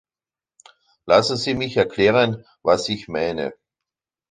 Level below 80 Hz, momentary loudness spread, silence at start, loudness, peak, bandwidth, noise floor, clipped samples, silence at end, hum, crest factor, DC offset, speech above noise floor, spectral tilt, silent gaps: -54 dBFS; 9 LU; 1.05 s; -20 LUFS; -2 dBFS; 9.6 kHz; under -90 dBFS; under 0.1%; 0.8 s; none; 20 dB; under 0.1%; over 70 dB; -5 dB/octave; none